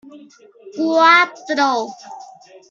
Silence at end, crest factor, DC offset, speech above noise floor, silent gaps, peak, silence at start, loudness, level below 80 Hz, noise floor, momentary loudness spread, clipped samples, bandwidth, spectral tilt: 0.45 s; 16 dB; under 0.1%; 25 dB; none; -2 dBFS; 0.15 s; -15 LUFS; -76 dBFS; -42 dBFS; 24 LU; under 0.1%; 7.6 kHz; -2 dB/octave